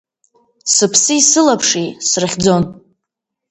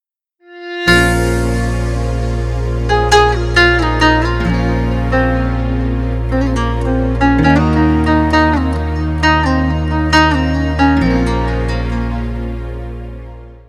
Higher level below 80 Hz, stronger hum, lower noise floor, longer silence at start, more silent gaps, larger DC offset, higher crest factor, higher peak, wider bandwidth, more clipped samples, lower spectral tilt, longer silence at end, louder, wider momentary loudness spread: second, -48 dBFS vs -20 dBFS; neither; first, -79 dBFS vs -50 dBFS; first, 0.65 s vs 0.5 s; neither; neither; about the same, 16 dB vs 14 dB; about the same, 0 dBFS vs 0 dBFS; second, 10 kHz vs 13.5 kHz; neither; second, -2.5 dB/octave vs -6 dB/octave; first, 0.8 s vs 0.1 s; about the same, -12 LUFS vs -14 LUFS; second, 8 LU vs 11 LU